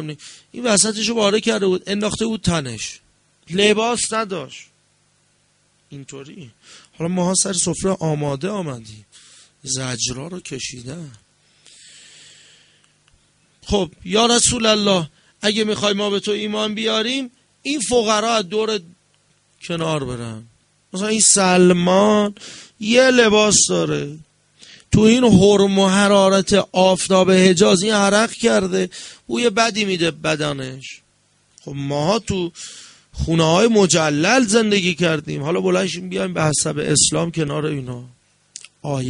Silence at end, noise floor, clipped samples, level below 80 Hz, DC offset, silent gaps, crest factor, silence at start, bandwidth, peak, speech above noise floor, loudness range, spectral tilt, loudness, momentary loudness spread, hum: 0 s; -61 dBFS; under 0.1%; -46 dBFS; under 0.1%; none; 18 dB; 0 s; 11 kHz; 0 dBFS; 43 dB; 12 LU; -3.5 dB/octave; -17 LUFS; 19 LU; none